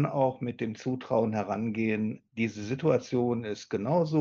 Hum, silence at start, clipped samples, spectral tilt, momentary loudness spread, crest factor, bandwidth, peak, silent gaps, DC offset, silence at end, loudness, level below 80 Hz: none; 0 s; under 0.1%; -7.5 dB/octave; 7 LU; 18 dB; 7.2 kHz; -12 dBFS; none; under 0.1%; 0 s; -30 LUFS; -72 dBFS